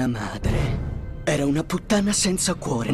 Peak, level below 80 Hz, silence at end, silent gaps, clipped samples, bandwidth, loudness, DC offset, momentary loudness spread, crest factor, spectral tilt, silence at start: -10 dBFS; -34 dBFS; 0 s; none; under 0.1%; 15 kHz; -23 LUFS; under 0.1%; 8 LU; 14 dB; -4.5 dB/octave; 0 s